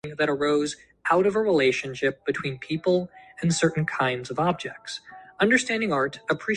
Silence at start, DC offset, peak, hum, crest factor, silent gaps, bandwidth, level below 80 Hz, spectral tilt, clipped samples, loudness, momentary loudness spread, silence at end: 0.05 s; under 0.1%; -6 dBFS; none; 18 dB; none; 11 kHz; -62 dBFS; -5 dB/octave; under 0.1%; -25 LUFS; 11 LU; 0 s